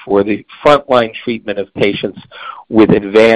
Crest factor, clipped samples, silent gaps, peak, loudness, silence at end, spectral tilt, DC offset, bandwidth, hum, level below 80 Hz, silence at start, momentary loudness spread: 12 dB; under 0.1%; none; 0 dBFS; -13 LUFS; 0 s; -6.5 dB/octave; under 0.1%; 9.6 kHz; none; -44 dBFS; 0 s; 15 LU